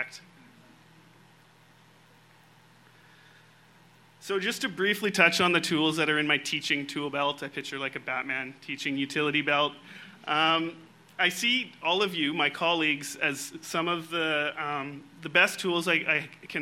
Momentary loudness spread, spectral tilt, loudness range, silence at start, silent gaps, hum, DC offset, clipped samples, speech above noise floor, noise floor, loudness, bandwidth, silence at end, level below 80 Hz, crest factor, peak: 12 LU; -3 dB/octave; 4 LU; 0 s; none; none; under 0.1%; under 0.1%; 30 dB; -58 dBFS; -27 LUFS; 16 kHz; 0 s; -76 dBFS; 24 dB; -6 dBFS